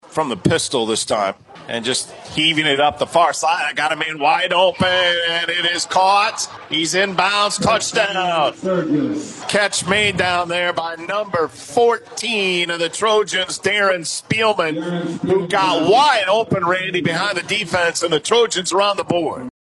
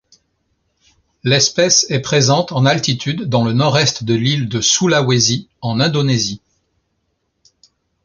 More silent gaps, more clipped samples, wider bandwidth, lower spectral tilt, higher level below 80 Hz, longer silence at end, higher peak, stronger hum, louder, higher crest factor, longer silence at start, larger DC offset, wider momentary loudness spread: neither; neither; first, 12 kHz vs 7.4 kHz; about the same, -3 dB/octave vs -3.5 dB/octave; about the same, -56 dBFS vs -52 dBFS; second, 0.15 s vs 1.65 s; about the same, 0 dBFS vs 0 dBFS; neither; about the same, -17 LUFS vs -15 LUFS; about the same, 18 dB vs 16 dB; second, 0.1 s vs 1.25 s; neither; about the same, 7 LU vs 7 LU